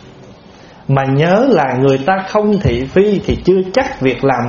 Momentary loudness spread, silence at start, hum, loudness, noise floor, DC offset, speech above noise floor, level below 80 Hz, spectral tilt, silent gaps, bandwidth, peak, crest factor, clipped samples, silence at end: 5 LU; 0.05 s; none; -13 LUFS; -39 dBFS; under 0.1%; 26 dB; -34 dBFS; -6 dB/octave; none; 7.2 kHz; 0 dBFS; 14 dB; under 0.1%; 0 s